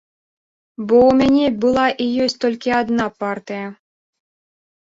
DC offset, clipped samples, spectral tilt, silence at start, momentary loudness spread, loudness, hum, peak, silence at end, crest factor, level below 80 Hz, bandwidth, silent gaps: under 0.1%; under 0.1%; -5.5 dB/octave; 0.8 s; 16 LU; -17 LUFS; none; -2 dBFS; 1.25 s; 16 dB; -50 dBFS; 7.8 kHz; none